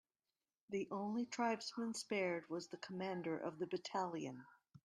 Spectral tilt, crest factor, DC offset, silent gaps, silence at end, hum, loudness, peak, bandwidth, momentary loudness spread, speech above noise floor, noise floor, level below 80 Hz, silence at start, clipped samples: -4.5 dB/octave; 18 dB; under 0.1%; none; 0.1 s; none; -44 LUFS; -26 dBFS; 12.5 kHz; 8 LU; over 47 dB; under -90 dBFS; -88 dBFS; 0.7 s; under 0.1%